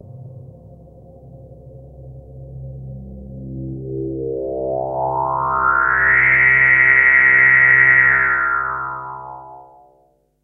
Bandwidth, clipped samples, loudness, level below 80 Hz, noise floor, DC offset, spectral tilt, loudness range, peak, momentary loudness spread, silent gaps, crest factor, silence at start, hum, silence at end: 3.6 kHz; under 0.1%; -12 LUFS; -42 dBFS; -58 dBFS; under 0.1%; -9.5 dB/octave; 19 LU; 0 dBFS; 25 LU; none; 18 dB; 0.1 s; none; 0.8 s